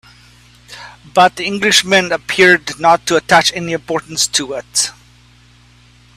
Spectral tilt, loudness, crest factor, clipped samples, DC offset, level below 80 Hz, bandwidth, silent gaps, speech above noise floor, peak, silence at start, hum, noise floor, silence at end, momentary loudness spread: -2 dB/octave; -13 LUFS; 16 dB; under 0.1%; under 0.1%; -50 dBFS; 15.5 kHz; none; 33 dB; 0 dBFS; 0.7 s; 60 Hz at -45 dBFS; -46 dBFS; 1.25 s; 10 LU